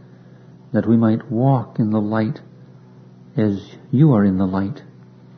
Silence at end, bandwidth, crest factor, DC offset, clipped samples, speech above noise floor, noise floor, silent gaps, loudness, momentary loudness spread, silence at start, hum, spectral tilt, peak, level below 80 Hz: 0.55 s; 6 kHz; 18 dB; under 0.1%; under 0.1%; 27 dB; -44 dBFS; none; -19 LUFS; 13 LU; 0.75 s; none; -10.5 dB/octave; -2 dBFS; -60 dBFS